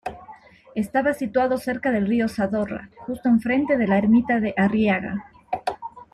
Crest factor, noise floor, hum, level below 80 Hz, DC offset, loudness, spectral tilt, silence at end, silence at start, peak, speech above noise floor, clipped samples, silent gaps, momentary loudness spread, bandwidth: 16 dB; -46 dBFS; none; -54 dBFS; under 0.1%; -22 LUFS; -7.5 dB/octave; 0.1 s; 0.05 s; -6 dBFS; 25 dB; under 0.1%; none; 14 LU; 13 kHz